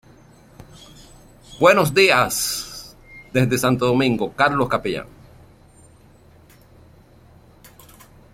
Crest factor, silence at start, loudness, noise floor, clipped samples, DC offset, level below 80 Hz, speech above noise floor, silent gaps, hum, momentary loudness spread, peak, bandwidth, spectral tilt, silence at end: 22 dB; 1.5 s; -18 LUFS; -50 dBFS; under 0.1%; under 0.1%; -50 dBFS; 32 dB; none; none; 18 LU; 0 dBFS; 16.5 kHz; -4.5 dB/octave; 3.3 s